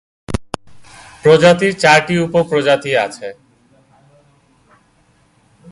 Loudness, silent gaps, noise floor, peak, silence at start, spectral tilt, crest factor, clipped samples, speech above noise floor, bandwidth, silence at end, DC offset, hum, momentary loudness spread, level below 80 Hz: -13 LUFS; none; -55 dBFS; 0 dBFS; 0.3 s; -5 dB/octave; 16 dB; under 0.1%; 42 dB; 11.5 kHz; 2.4 s; under 0.1%; none; 21 LU; -42 dBFS